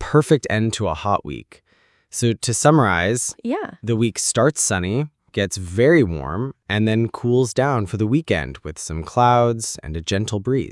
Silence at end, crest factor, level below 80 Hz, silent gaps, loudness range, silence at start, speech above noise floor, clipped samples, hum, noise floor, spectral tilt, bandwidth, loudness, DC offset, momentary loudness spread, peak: 0 s; 18 dB; -44 dBFS; none; 1 LU; 0 s; 33 dB; under 0.1%; none; -52 dBFS; -5 dB/octave; 12 kHz; -20 LUFS; under 0.1%; 11 LU; -2 dBFS